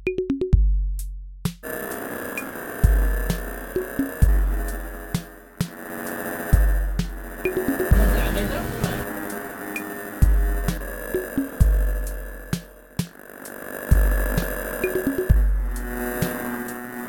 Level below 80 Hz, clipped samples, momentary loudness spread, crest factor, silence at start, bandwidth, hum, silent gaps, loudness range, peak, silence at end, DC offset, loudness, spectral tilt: -24 dBFS; under 0.1%; 11 LU; 20 dB; 0 s; 19 kHz; none; none; 3 LU; -4 dBFS; 0 s; under 0.1%; -25 LUFS; -6 dB/octave